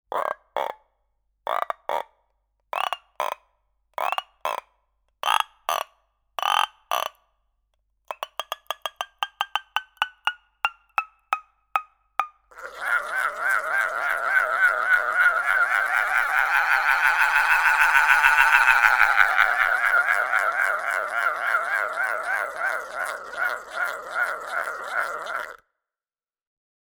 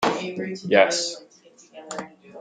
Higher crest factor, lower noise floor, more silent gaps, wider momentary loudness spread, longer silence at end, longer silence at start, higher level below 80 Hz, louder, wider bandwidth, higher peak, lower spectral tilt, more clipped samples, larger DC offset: about the same, 24 dB vs 24 dB; first, under -90 dBFS vs -50 dBFS; neither; second, 15 LU vs 19 LU; first, 1.3 s vs 0 s; about the same, 0.1 s vs 0 s; first, -58 dBFS vs -68 dBFS; about the same, -22 LUFS vs -22 LUFS; first, over 20 kHz vs 9.6 kHz; about the same, 0 dBFS vs -2 dBFS; second, 1 dB/octave vs -3 dB/octave; neither; neither